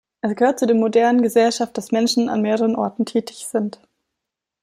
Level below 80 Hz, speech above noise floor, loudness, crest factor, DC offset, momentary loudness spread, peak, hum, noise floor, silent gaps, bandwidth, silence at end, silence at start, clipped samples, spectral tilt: -66 dBFS; 64 dB; -19 LUFS; 16 dB; under 0.1%; 9 LU; -4 dBFS; none; -83 dBFS; none; 15 kHz; 0.9 s; 0.25 s; under 0.1%; -4.5 dB/octave